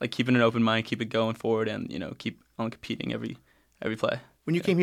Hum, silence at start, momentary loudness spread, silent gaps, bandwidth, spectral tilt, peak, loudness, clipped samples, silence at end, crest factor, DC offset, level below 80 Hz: none; 0 s; 13 LU; none; 13.5 kHz; -6.5 dB/octave; -10 dBFS; -29 LUFS; under 0.1%; 0 s; 18 dB; under 0.1%; -66 dBFS